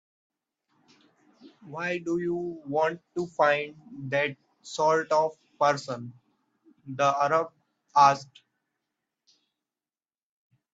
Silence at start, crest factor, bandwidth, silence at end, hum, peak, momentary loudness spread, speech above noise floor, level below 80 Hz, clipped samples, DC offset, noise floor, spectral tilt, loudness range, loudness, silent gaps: 1.45 s; 24 dB; 8 kHz; 2.5 s; none; -6 dBFS; 17 LU; over 64 dB; -74 dBFS; under 0.1%; under 0.1%; under -90 dBFS; -5 dB/octave; 3 LU; -26 LUFS; none